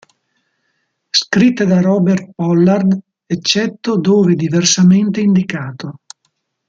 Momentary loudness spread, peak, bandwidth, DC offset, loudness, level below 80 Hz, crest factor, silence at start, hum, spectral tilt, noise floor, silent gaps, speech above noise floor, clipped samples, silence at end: 11 LU; 0 dBFS; 7.8 kHz; under 0.1%; -13 LUFS; -56 dBFS; 14 dB; 1.15 s; none; -5 dB/octave; -67 dBFS; none; 54 dB; under 0.1%; 0.75 s